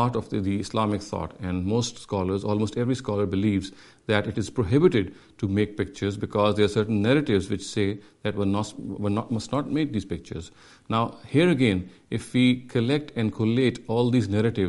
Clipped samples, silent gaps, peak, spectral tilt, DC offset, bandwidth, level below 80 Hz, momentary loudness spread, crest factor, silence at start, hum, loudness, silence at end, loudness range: under 0.1%; none; -4 dBFS; -6.5 dB/octave; under 0.1%; 11.5 kHz; -52 dBFS; 10 LU; 20 dB; 0 s; none; -25 LUFS; 0 s; 4 LU